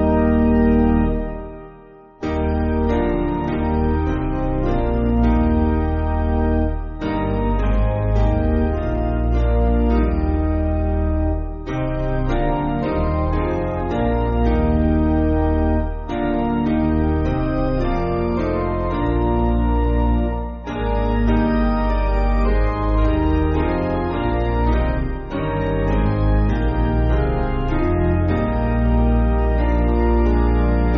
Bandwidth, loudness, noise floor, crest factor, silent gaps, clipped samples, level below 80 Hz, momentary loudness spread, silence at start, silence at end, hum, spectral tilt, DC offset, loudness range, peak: 5.2 kHz; -20 LUFS; -43 dBFS; 12 dB; none; under 0.1%; -22 dBFS; 5 LU; 0 s; 0 s; none; -8 dB/octave; under 0.1%; 2 LU; -6 dBFS